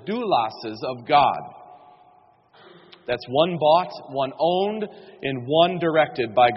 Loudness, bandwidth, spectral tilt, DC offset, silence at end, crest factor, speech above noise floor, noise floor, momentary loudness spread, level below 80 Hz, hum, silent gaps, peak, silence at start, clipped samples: -22 LUFS; 6 kHz; -3 dB/octave; under 0.1%; 0 s; 20 dB; 34 dB; -56 dBFS; 13 LU; -62 dBFS; none; none; -4 dBFS; 0.05 s; under 0.1%